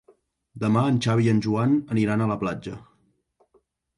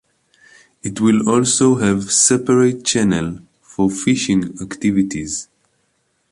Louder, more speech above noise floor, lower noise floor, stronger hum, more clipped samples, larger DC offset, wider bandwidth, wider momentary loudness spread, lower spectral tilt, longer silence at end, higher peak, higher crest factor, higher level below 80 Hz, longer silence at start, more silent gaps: second, -23 LUFS vs -16 LUFS; second, 44 dB vs 49 dB; about the same, -67 dBFS vs -65 dBFS; neither; neither; neither; about the same, 11 kHz vs 11.5 kHz; about the same, 12 LU vs 14 LU; first, -7.5 dB/octave vs -4 dB/octave; first, 1.2 s vs 0.9 s; second, -10 dBFS vs 0 dBFS; about the same, 14 dB vs 18 dB; second, -56 dBFS vs -48 dBFS; second, 0.55 s vs 0.85 s; neither